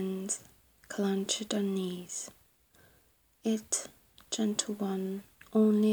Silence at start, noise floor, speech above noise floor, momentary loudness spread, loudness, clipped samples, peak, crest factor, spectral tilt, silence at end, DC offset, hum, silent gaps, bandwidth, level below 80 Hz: 0 s; -67 dBFS; 36 dB; 11 LU; -33 LUFS; under 0.1%; -14 dBFS; 18 dB; -4.5 dB/octave; 0 s; under 0.1%; none; none; over 20 kHz; -74 dBFS